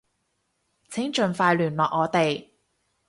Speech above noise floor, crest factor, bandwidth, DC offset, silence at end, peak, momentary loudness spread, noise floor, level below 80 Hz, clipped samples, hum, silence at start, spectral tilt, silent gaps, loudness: 51 dB; 20 dB; 11.5 kHz; under 0.1%; 0.65 s; -6 dBFS; 10 LU; -74 dBFS; -66 dBFS; under 0.1%; none; 0.9 s; -5.5 dB/octave; none; -24 LUFS